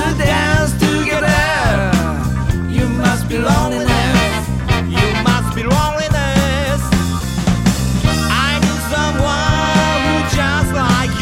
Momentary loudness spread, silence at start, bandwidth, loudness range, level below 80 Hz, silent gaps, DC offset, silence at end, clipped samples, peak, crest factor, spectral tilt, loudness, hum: 4 LU; 0 s; 16.5 kHz; 1 LU; -24 dBFS; none; under 0.1%; 0 s; under 0.1%; 0 dBFS; 14 dB; -5 dB/octave; -15 LUFS; none